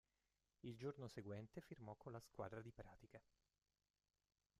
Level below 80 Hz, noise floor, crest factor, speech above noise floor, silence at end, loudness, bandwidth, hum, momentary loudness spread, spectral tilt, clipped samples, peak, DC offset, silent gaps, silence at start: -80 dBFS; under -90 dBFS; 20 dB; over 34 dB; 1.4 s; -57 LUFS; 13.5 kHz; none; 11 LU; -7 dB/octave; under 0.1%; -38 dBFS; under 0.1%; none; 0.65 s